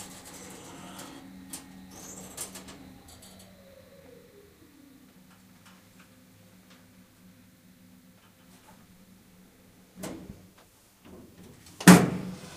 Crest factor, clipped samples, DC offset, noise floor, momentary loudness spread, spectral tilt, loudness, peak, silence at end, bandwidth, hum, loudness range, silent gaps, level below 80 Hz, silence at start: 30 dB; under 0.1%; under 0.1%; -59 dBFS; 32 LU; -5 dB/octave; -22 LUFS; 0 dBFS; 0.2 s; 15.5 kHz; none; 30 LU; none; -62 dBFS; 1.55 s